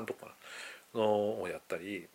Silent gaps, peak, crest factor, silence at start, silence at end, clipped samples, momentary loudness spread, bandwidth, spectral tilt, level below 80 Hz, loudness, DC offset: none; -18 dBFS; 18 dB; 0 s; 0.1 s; under 0.1%; 15 LU; 16.5 kHz; -5 dB/octave; -78 dBFS; -36 LUFS; under 0.1%